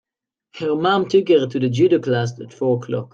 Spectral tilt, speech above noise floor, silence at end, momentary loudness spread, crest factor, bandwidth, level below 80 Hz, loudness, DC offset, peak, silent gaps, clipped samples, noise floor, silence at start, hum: -7 dB/octave; 65 dB; 0.1 s; 8 LU; 14 dB; 7.6 kHz; -64 dBFS; -19 LUFS; under 0.1%; -4 dBFS; none; under 0.1%; -83 dBFS; 0.55 s; none